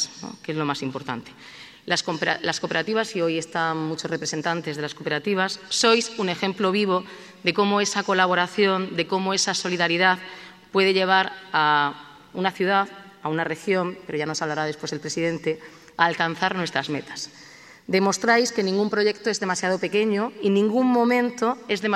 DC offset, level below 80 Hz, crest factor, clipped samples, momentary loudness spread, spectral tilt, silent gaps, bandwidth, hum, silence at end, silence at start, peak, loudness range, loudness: under 0.1%; -70 dBFS; 22 dB; under 0.1%; 12 LU; -3.5 dB/octave; none; 13.5 kHz; none; 0 s; 0 s; -2 dBFS; 4 LU; -23 LUFS